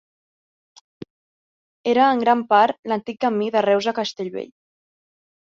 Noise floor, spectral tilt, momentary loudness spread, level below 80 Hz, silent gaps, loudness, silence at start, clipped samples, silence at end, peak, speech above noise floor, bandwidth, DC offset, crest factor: under -90 dBFS; -5 dB/octave; 13 LU; -70 dBFS; 2.79-2.83 s; -20 LUFS; 1.85 s; under 0.1%; 1.15 s; -4 dBFS; over 71 dB; 7.6 kHz; under 0.1%; 20 dB